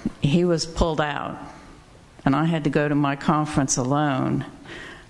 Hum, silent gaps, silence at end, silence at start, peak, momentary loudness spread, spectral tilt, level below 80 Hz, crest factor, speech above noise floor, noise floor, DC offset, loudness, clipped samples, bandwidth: none; none; 0.05 s; 0 s; -6 dBFS; 15 LU; -5.5 dB/octave; -40 dBFS; 18 dB; 26 dB; -48 dBFS; under 0.1%; -22 LUFS; under 0.1%; 12 kHz